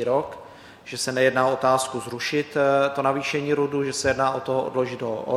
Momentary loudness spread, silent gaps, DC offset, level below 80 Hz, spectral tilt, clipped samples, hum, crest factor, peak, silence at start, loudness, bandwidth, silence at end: 9 LU; none; under 0.1%; -58 dBFS; -4 dB/octave; under 0.1%; none; 18 dB; -6 dBFS; 0 s; -23 LUFS; 15 kHz; 0 s